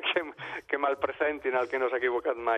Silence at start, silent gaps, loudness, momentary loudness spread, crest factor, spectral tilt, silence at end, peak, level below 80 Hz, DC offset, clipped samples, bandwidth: 0 s; none; -30 LUFS; 5 LU; 16 dB; -5 dB/octave; 0 s; -12 dBFS; -66 dBFS; under 0.1%; under 0.1%; 8.2 kHz